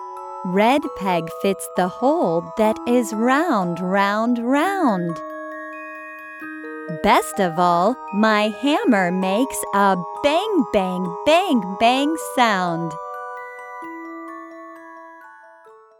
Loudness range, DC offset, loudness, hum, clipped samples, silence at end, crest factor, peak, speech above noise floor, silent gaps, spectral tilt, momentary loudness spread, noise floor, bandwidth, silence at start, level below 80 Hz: 4 LU; under 0.1%; -19 LUFS; none; under 0.1%; 0.25 s; 18 dB; -2 dBFS; 28 dB; none; -5 dB/octave; 16 LU; -47 dBFS; 19.5 kHz; 0 s; -56 dBFS